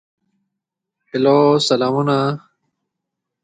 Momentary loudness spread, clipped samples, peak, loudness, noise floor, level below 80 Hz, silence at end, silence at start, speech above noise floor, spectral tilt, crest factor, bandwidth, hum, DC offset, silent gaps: 12 LU; under 0.1%; -2 dBFS; -16 LUFS; -81 dBFS; -64 dBFS; 1.05 s; 1.15 s; 66 dB; -6 dB/octave; 18 dB; 9.4 kHz; none; under 0.1%; none